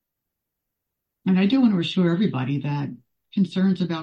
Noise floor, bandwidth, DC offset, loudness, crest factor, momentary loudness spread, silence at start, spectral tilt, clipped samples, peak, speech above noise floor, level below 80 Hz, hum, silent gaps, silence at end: -82 dBFS; 7.2 kHz; under 0.1%; -22 LUFS; 14 dB; 11 LU; 1.25 s; -8 dB/octave; under 0.1%; -8 dBFS; 61 dB; -66 dBFS; none; none; 0 s